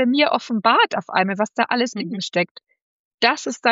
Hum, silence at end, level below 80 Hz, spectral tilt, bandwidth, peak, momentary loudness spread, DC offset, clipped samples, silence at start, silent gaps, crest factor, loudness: none; 0 s; -78 dBFS; -2 dB/octave; 7.8 kHz; -2 dBFS; 7 LU; under 0.1%; under 0.1%; 0 s; 2.51-2.55 s, 2.82-3.18 s; 18 dB; -20 LUFS